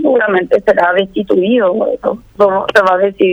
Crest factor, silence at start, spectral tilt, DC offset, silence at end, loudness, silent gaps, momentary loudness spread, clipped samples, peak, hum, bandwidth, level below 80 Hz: 12 dB; 0 s; -6 dB/octave; under 0.1%; 0 s; -12 LUFS; none; 5 LU; under 0.1%; 0 dBFS; none; 11.5 kHz; -48 dBFS